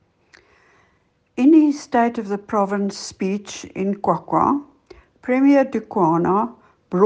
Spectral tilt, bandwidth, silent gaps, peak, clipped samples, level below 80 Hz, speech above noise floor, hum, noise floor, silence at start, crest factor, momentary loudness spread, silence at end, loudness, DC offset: -6.5 dB/octave; 9.2 kHz; none; -2 dBFS; under 0.1%; -60 dBFS; 43 dB; none; -63 dBFS; 1.35 s; 18 dB; 12 LU; 0 s; -19 LUFS; under 0.1%